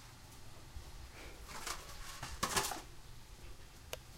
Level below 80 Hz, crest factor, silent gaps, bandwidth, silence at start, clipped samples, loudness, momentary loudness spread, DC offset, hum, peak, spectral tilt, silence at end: -54 dBFS; 26 dB; none; 16 kHz; 0 s; under 0.1%; -43 LUFS; 19 LU; under 0.1%; none; -20 dBFS; -2 dB/octave; 0 s